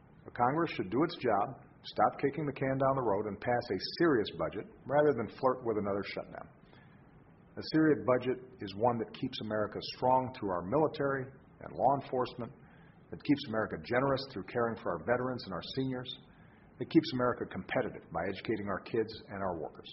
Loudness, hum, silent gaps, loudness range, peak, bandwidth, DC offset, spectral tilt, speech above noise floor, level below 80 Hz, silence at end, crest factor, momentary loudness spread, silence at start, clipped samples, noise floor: -33 LUFS; none; none; 3 LU; -14 dBFS; 5.8 kHz; under 0.1%; -5 dB/octave; 26 dB; -64 dBFS; 0 s; 20 dB; 13 LU; 0.25 s; under 0.1%; -59 dBFS